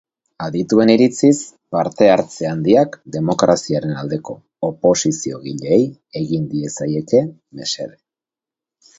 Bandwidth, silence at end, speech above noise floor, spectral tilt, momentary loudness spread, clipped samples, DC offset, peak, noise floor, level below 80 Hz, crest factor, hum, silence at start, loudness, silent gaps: 8.2 kHz; 1.1 s; 72 dB; -5.5 dB/octave; 13 LU; under 0.1%; under 0.1%; 0 dBFS; -89 dBFS; -56 dBFS; 18 dB; none; 0.4 s; -17 LUFS; none